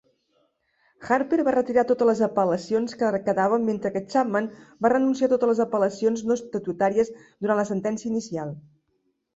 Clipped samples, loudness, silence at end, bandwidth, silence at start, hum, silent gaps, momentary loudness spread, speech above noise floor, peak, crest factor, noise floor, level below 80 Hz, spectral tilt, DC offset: under 0.1%; -24 LUFS; 0.75 s; 8 kHz; 1 s; none; none; 8 LU; 49 dB; -8 dBFS; 16 dB; -72 dBFS; -64 dBFS; -6.5 dB/octave; under 0.1%